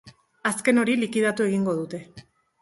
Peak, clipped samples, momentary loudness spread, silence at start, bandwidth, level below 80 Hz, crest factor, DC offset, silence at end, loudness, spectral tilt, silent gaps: -6 dBFS; under 0.1%; 10 LU; 0.05 s; 11.5 kHz; -66 dBFS; 18 dB; under 0.1%; 0.4 s; -23 LUFS; -5 dB/octave; none